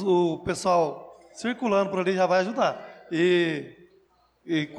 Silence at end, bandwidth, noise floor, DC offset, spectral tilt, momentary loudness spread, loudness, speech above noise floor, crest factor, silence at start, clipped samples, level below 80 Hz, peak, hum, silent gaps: 0 s; 11.5 kHz; -63 dBFS; under 0.1%; -5.5 dB/octave; 13 LU; -25 LUFS; 39 dB; 14 dB; 0 s; under 0.1%; -62 dBFS; -12 dBFS; none; none